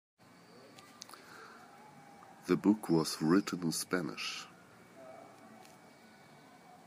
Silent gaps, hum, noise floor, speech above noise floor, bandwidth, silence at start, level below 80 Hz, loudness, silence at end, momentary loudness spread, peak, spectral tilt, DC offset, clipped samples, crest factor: none; none; -59 dBFS; 26 dB; 15.5 kHz; 0.65 s; -78 dBFS; -33 LUFS; 0.1 s; 26 LU; -16 dBFS; -5 dB/octave; under 0.1%; under 0.1%; 22 dB